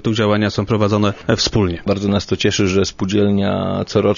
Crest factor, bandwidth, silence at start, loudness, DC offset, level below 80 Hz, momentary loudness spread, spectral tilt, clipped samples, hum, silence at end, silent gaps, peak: 16 dB; 7.4 kHz; 0.05 s; -17 LUFS; under 0.1%; -40 dBFS; 3 LU; -5.5 dB/octave; under 0.1%; none; 0 s; none; 0 dBFS